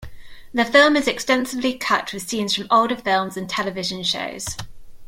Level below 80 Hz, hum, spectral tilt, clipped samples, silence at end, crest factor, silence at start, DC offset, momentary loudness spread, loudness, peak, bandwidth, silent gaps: -48 dBFS; none; -3 dB/octave; under 0.1%; 0 s; 20 dB; 0 s; under 0.1%; 13 LU; -20 LUFS; -2 dBFS; 16.5 kHz; none